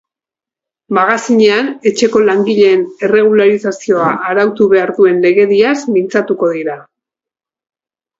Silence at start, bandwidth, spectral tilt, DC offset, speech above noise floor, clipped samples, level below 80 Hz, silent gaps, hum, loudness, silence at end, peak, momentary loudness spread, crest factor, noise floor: 0.9 s; 8 kHz; -5 dB/octave; under 0.1%; 77 dB; under 0.1%; -58 dBFS; none; none; -11 LUFS; 1.35 s; 0 dBFS; 6 LU; 12 dB; -88 dBFS